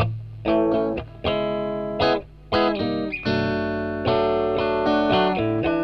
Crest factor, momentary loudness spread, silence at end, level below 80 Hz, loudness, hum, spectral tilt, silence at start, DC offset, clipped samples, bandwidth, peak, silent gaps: 14 dB; 7 LU; 0 s; -44 dBFS; -23 LUFS; 50 Hz at -45 dBFS; -7.5 dB/octave; 0 s; under 0.1%; under 0.1%; 6.4 kHz; -8 dBFS; none